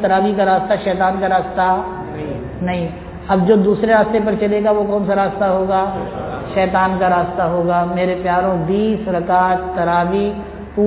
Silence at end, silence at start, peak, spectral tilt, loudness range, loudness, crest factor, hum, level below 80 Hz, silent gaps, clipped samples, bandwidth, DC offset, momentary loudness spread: 0 s; 0 s; -2 dBFS; -11 dB/octave; 2 LU; -17 LUFS; 14 dB; none; -38 dBFS; none; under 0.1%; 4 kHz; under 0.1%; 11 LU